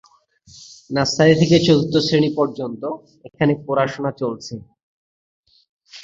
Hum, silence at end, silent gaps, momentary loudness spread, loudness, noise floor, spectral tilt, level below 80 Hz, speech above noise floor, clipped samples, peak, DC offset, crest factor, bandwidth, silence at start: none; 0 s; 4.83-5.43 s, 5.69-5.77 s; 16 LU; -18 LUFS; -52 dBFS; -6 dB/octave; -54 dBFS; 34 dB; under 0.1%; -2 dBFS; under 0.1%; 18 dB; 7.8 kHz; 0.6 s